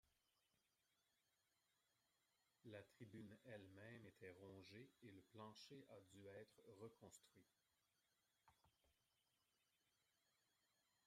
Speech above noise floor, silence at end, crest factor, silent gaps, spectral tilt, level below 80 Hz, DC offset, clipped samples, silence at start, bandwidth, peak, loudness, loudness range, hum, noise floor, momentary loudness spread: 25 dB; 0 s; 22 dB; none; -5 dB/octave; under -90 dBFS; under 0.1%; under 0.1%; 0.05 s; 14 kHz; -46 dBFS; -64 LUFS; 5 LU; none; -89 dBFS; 5 LU